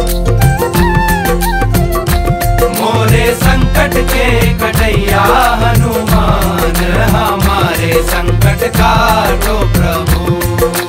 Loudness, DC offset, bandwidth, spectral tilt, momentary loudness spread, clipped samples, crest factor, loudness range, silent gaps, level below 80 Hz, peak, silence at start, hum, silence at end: -11 LUFS; under 0.1%; 16.5 kHz; -5 dB/octave; 4 LU; under 0.1%; 10 dB; 1 LU; none; -16 dBFS; 0 dBFS; 0 s; none; 0 s